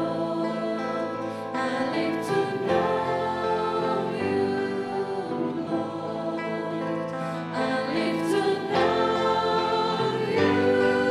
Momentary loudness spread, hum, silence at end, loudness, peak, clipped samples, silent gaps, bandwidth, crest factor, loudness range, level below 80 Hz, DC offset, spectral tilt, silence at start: 7 LU; none; 0 s; -26 LUFS; -8 dBFS; under 0.1%; none; 13.5 kHz; 18 dB; 5 LU; -64 dBFS; under 0.1%; -6 dB/octave; 0 s